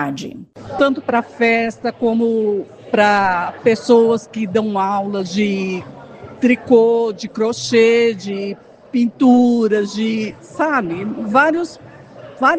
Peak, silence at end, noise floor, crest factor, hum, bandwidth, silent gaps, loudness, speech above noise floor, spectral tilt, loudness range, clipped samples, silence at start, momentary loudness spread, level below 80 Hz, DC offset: 0 dBFS; 0 s; -38 dBFS; 16 dB; none; 9 kHz; none; -16 LUFS; 22 dB; -5.5 dB/octave; 2 LU; under 0.1%; 0 s; 13 LU; -58 dBFS; under 0.1%